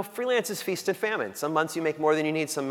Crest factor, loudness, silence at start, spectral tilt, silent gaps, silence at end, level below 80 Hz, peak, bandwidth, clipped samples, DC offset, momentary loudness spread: 18 dB; -27 LUFS; 0 s; -4 dB/octave; none; 0 s; -80 dBFS; -10 dBFS; 18 kHz; under 0.1%; under 0.1%; 4 LU